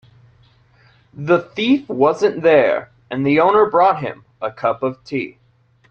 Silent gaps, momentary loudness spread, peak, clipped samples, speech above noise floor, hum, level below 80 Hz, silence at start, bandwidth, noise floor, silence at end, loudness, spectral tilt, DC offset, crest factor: none; 15 LU; -2 dBFS; under 0.1%; 37 dB; none; -60 dBFS; 1.15 s; 7.8 kHz; -53 dBFS; 0.6 s; -17 LUFS; -7 dB/octave; under 0.1%; 16 dB